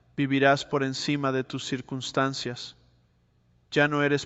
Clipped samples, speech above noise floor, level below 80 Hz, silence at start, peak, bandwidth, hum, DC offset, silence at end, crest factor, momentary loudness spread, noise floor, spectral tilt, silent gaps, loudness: under 0.1%; 39 dB; -64 dBFS; 0.15 s; -8 dBFS; 8.2 kHz; none; under 0.1%; 0 s; 20 dB; 11 LU; -65 dBFS; -5 dB/octave; none; -26 LUFS